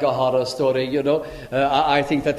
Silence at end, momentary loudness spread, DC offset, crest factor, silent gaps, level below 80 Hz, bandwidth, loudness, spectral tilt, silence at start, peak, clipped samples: 0 s; 4 LU; under 0.1%; 16 dB; none; -48 dBFS; 15 kHz; -20 LUFS; -5.5 dB/octave; 0 s; -4 dBFS; under 0.1%